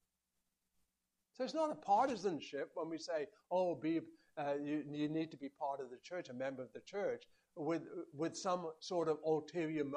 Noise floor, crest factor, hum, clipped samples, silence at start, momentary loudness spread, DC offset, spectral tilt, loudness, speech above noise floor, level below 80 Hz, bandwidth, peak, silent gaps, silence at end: -88 dBFS; 18 dB; none; under 0.1%; 1.4 s; 10 LU; under 0.1%; -5.5 dB/octave; -41 LUFS; 48 dB; -84 dBFS; 10 kHz; -22 dBFS; none; 0 s